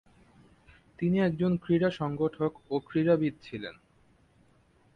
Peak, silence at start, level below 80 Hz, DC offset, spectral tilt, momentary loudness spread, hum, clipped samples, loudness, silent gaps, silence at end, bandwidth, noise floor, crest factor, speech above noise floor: -14 dBFS; 1 s; -62 dBFS; under 0.1%; -9 dB/octave; 14 LU; none; under 0.1%; -29 LUFS; none; 1.25 s; 6.6 kHz; -64 dBFS; 18 dB; 36 dB